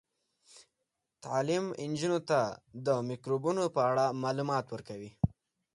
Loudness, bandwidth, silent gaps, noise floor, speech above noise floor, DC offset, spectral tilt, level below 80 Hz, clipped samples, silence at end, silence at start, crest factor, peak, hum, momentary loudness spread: -32 LUFS; 11.5 kHz; none; -85 dBFS; 53 dB; under 0.1%; -6 dB/octave; -58 dBFS; under 0.1%; 0.45 s; 0.55 s; 20 dB; -14 dBFS; none; 8 LU